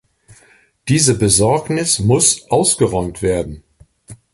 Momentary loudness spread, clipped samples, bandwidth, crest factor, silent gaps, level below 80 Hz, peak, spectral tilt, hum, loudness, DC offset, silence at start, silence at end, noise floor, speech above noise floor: 8 LU; under 0.1%; 12 kHz; 16 dB; none; -38 dBFS; 0 dBFS; -4 dB/octave; none; -14 LUFS; under 0.1%; 0.85 s; 0.2 s; -52 dBFS; 37 dB